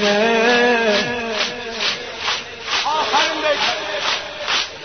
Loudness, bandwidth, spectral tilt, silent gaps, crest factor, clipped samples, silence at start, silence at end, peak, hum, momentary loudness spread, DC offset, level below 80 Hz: -18 LUFS; 6.6 kHz; -2 dB/octave; none; 16 dB; under 0.1%; 0 s; 0 s; -4 dBFS; none; 8 LU; 0.2%; -54 dBFS